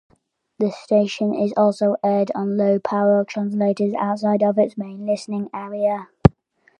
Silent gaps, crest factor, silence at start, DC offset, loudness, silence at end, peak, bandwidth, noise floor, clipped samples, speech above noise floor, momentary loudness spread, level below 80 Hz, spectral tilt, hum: none; 20 dB; 0.6 s; under 0.1%; -20 LUFS; 0.5 s; 0 dBFS; 9.4 kHz; -57 dBFS; under 0.1%; 37 dB; 7 LU; -42 dBFS; -8 dB/octave; none